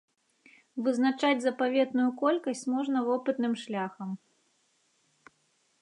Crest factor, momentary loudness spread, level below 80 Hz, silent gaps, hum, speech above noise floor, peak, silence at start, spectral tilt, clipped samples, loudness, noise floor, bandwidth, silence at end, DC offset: 18 dB; 11 LU; -86 dBFS; none; none; 43 dB; -14 dBFS; 0.75 s; -5 dB/octave; under 0.1%; -29 LUFS; -72 dBFS; 11 kHz; 1.65 s; under 0.1%